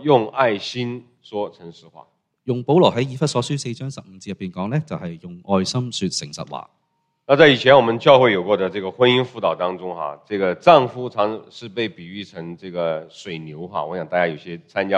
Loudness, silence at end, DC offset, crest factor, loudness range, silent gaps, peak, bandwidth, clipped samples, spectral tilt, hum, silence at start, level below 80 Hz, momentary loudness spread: -19 LUFS; 0 s; under 0.1%; 20 dB; 10 LU; none; 0 dBFS; 10.5 kHz; under 0.1%; -5.5 dB/octave; none; 0 s; -62 dBFS; 19 LU